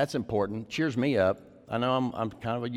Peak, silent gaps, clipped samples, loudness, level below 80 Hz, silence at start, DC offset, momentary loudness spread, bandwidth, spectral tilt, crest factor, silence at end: -14 dBFS; none; under 0.1%; -29 LUFS; -60 dBFS; 0 s; under 0.1%; 8 LU; 14 kHz; -6.5 dB/octave; 16 dB; 0 s